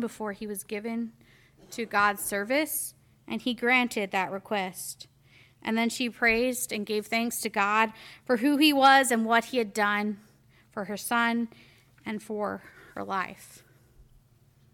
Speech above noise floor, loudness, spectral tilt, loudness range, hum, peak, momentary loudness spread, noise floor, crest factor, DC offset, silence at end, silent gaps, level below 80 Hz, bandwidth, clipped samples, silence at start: 34 dB; -27 LUFS; -3 dB/octave; 8 LU; none; -8 dBFS; 16 LU; -61 dBFS; 20 dB; under 0.1%; 0.7 s; none; -64 dBFS; 18 kHz; under 0.1%; 0 s